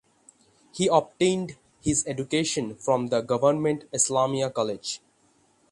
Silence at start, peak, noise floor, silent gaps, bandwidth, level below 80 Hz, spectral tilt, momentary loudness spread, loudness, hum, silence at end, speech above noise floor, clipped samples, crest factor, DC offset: 0.75 s; -6 dBFS; -64 dBFS; none; 11.5 kHz; -56 dBFS; -4 dB/octave; 10 LU; -25 LUFS; none; 0.75 s; 39 dB; under 0.1%; 20 dB; under 0.1%